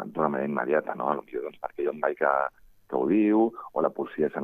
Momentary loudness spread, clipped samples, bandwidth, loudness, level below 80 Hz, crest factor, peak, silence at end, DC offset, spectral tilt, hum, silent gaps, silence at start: 10 LU; under 0.1%; 3.8 kHz; -27 LUFS; -66 dBFS; 18 dB; -8 dBFS; 0 s; under 0.1%; -9.5 dB/octave; none; none; 0 s